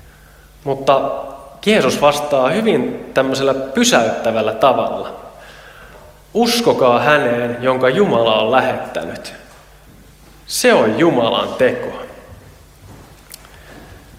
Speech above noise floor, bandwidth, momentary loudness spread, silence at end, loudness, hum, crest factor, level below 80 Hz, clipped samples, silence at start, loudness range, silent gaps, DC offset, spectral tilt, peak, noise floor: 29 dB; 16.5 kHz; 15 LU; 0.2 s; -15 LUFS; none; 16 dB; -48 dBFS; under 0.1%; 0.65 s; 3 LU; none; under 0.1%; -4 dB/octave; 0 dBFS; -44 dBFS